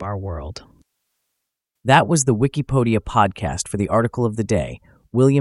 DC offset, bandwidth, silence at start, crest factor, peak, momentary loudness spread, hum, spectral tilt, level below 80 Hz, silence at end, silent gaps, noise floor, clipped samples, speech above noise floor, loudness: under 0.1%; 12 kHz; 0 s; 20 dB; 0 dBFS; 14 LU; none; -5.5 dB/octave; -40 dBFS; 0 s; none; -79 dBFS; under 0.1%; 60 dB; -19 LUFS